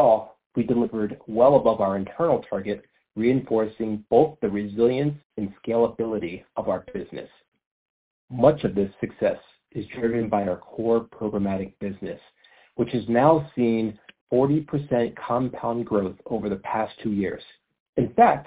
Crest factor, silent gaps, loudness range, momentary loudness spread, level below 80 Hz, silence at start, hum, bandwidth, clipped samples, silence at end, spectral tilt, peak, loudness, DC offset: 20 dB; 0.46-0.50 s, 5.25-5.30 s, 7.48-7.52 s, 7.66-8.28 s, 14.21-14.27 s, 17.80-17.93 s; 4 LU; 13 LU; -54 dBFS; 0 s; none; 4 kHz; under 0.1%; 0.05 s; -11.5 dB/octave; -4 dBFS; -24 LUFS; under 0.1%